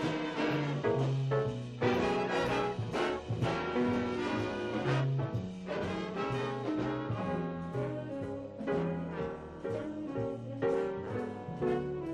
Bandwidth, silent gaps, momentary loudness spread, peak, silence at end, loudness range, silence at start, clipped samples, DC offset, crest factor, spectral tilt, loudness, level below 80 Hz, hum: 10.5 kHz; none; 7 LU; -18 dBFS; 0 s; 4 LU; 0 s; under 0.1%; under 0.1%; 16 dB; -7 dB/octave; -34 LUFS; -58 dBFS; none